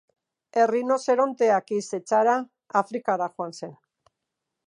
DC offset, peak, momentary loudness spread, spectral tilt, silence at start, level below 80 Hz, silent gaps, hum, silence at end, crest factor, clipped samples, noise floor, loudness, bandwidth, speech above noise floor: under 0.1%; -8 dBFS; 11 LU; -5 dB/octave; 0.55 s; -82 dBFS; none; none; 0.95 s; 18 dB; under 0.1%; -83 dBFS; -24 LUFS; 11 kHz; 60 dB